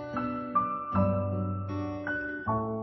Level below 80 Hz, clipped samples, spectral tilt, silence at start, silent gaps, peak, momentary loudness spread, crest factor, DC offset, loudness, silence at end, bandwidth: -56 dBFS; under 0.1%; -10 dB/octave; 0 s; none; -16 dBFS; 6 LU; 16 dB; under 0.1%; -31 LUFS; 0 s; 6 kHz